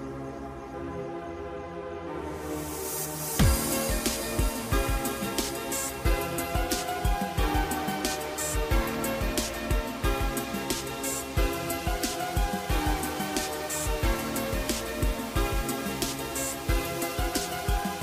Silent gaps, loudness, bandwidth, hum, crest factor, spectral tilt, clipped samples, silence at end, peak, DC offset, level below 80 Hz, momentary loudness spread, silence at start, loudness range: none; -30 LUFS; 16 kHz; none; 18 dB; -4 dB/octave; under 0.1%; 0 s; -10 dBFS; under 0.1%; -34 dBFS; 8 LU; 0 s; 2 LU